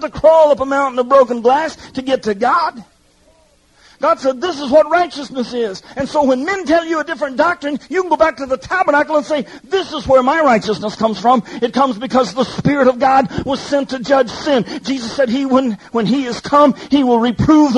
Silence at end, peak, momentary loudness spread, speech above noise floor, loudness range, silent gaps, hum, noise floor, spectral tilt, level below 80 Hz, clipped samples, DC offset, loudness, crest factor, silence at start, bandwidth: 0 s; 0 dBFS; 9 LU; 38 dB; 3 LU; none; none; -52 dBFS; -5.5 dB/octave; -44 dBFS; under 0.1%; under 0.1%; -15 LUFS; 14 dB; 0 s; 11 kHz